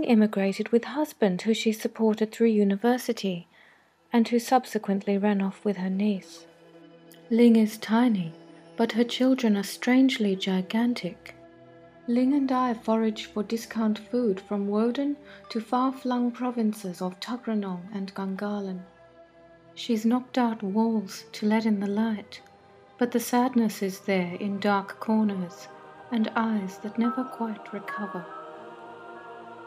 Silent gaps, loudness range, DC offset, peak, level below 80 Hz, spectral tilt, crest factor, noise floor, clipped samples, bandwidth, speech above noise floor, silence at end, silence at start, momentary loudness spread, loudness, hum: none; 6 LU; under 0.1%; -8 dBFS; -74 dBFS; -6 dB/octave; 18 dB; -59 dBFS; under 0.1%; 15.5 kHz; 34 dB; 0 s; 0 s; 15 LU; -26 LUFS; none